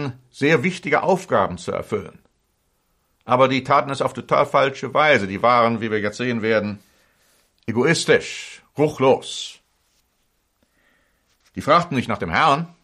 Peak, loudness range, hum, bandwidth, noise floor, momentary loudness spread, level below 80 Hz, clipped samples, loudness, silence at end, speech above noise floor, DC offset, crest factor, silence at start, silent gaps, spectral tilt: -4 dBFS; 5 LU; none; 14.5 kHz; -68 dBFS; 14 LU; -56 dBFS; under 0.1%; -19 LUFS; 0.15 s; 48 dB; under 0.1%; 18 dB; 0 s; none; -5 dB/octave